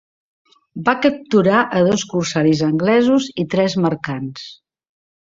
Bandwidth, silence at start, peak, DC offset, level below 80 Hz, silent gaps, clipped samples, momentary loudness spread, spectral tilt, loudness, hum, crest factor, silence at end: 7.8 kHz; 0.75 s; -2 dBFS; under 0.1%; -56 dBFS; none; under 0.1%; 12 LU; -5.5 dB/octave; -17 LUFS; none; 16 dB; 0.75 s